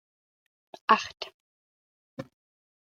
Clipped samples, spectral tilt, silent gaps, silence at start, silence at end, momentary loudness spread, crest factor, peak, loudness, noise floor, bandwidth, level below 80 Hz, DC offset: under 0.1%; -3 dB/octave; 1.34-2.17 s; 0.9 s; 0.65 s; 22 LU; 28 dB; -4 dBFS; -27 LUFS; under -90 dBFS; 7.6 kHz; -76 dBFS; under 0.1%